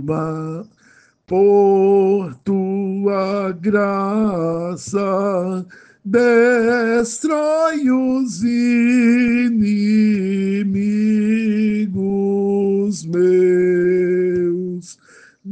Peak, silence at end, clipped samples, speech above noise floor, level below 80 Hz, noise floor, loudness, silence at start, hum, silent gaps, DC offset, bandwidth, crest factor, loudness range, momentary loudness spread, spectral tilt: -4 dBFS; 0 s; under 0.1%; 36 dB; -56 dBFS; -52 dBFS; -17 LUFS; 0 s; none; none; under 0.1%; 9.4 kHz; 14 dB; 3 LU; 8 LU; -7 dB/octave